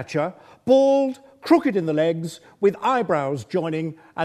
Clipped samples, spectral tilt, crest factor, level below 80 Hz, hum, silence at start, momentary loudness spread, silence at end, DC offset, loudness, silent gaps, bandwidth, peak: under 0.1%; -6.5 dB/octave; 18 dB; -66 dBFS; none; 0 s; 12 LU; 0 s; under 0.1%; -21 LUFS; none; 13.5 kHz; -4 dBFS